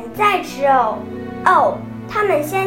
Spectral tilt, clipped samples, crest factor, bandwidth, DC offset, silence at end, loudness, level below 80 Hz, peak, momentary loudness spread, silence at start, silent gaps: -5 dB/octave; under 0.1%; 16 dB; 16.5 kHz; under 0.1%; 0 s; -17 LUFS; -50 dBFS; 0 dBFS; 12 LU; 0 s; none